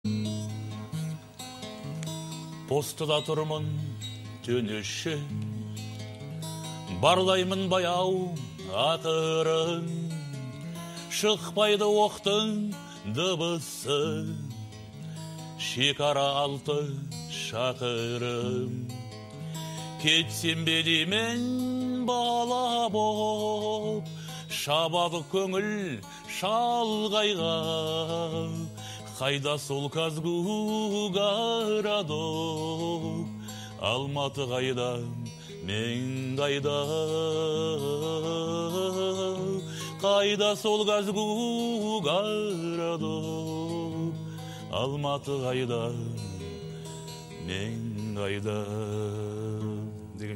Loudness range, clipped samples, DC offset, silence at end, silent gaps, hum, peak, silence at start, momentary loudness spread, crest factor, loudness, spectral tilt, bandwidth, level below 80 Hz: 6 LU; under 0.1%; under 0.1%; 0 s; none; none; -6 dBFS; 0.05 s; 14 LU; 22 dB; -29 LUFS; -4.5 dB/octave; 16 kHz; -64 dBFS